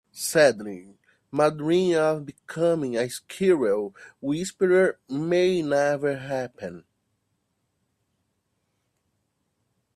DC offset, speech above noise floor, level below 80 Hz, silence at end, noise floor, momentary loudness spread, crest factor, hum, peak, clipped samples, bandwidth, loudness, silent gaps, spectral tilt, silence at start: under 0.1%; 51 dB; -68 dBFS; 3.2 s; -75 dBFS; 15 LU; 20 dB; none; -6 dBFS; under 0.1%; 14 kHz; -24 LUFS; none; -5 dB/octave; 0.15 s